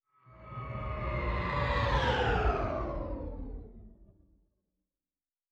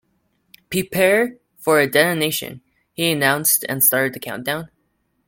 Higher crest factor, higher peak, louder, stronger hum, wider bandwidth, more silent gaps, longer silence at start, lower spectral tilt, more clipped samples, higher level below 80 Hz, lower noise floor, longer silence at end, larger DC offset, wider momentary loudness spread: about the same, 18 dB vs 20 dB; second, -18 dBFS vs 0 dBFS; second, -33 LUFS vs -18 LUFS; neither; second, 8 kHz vs 17 kHz; neither; second, 0.3 s vs 0.7 s; first, -6.5 dB/octave vs -3 dB/octave; neither; first, -40 dBFS vs -58 dBFS; first, under -90 dBFS vs -68 dBFS; first, 1.45 s vs 0.6 s; neither; first, 17 LU vs 12 LU